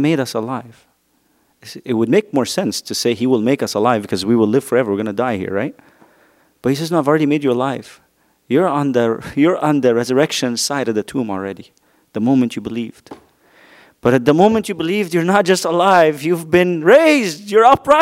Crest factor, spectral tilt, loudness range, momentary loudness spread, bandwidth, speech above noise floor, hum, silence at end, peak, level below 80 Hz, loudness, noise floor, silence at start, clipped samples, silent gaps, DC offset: 16 dB; -5 dB/octave; 6 LU; 12 LU; 16 kHz; 45 dB; none; 0 s; 0 dBFS; -56 dBFS; -16 LUFS; -61 dBFS; 0 s; under 0.1%; none; under 0.1%